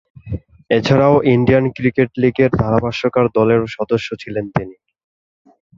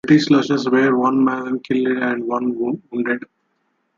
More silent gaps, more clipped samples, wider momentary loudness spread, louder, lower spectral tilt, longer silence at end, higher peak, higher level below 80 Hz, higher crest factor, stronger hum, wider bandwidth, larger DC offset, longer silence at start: neither; neither; first, 14 LU vs 9 LU; about the same, -16 LUFS vs -18 LUFS; first, -8 dB/octave vs -6.5 dB/octave; first, 1.05 s vs 0.8 s; about the same, 0 dBFS vs -2 dBFS; first, -42 dBFS vs -62 dBFS; about the same, 16 dB vs 16 dB; neither; about the same, 7.4 kHz vs 7.4 kHz; neither; first, 0.25 s vs 0.05 s